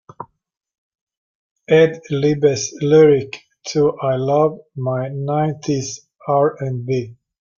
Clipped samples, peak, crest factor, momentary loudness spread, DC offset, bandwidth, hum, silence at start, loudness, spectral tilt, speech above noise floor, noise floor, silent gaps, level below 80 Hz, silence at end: under 0.1%; -2 dBFS; 16 dB; 17 LU; under 0.1%; 7.4 kHz; none; 0.2 s; -18 LUFS; -6 dB/octave; 22 dB; -38 dBFS; 0.78-0.90 s, 1.01-1.07 s, 1.17-1.56 s; -58 dBFS; 0.45 s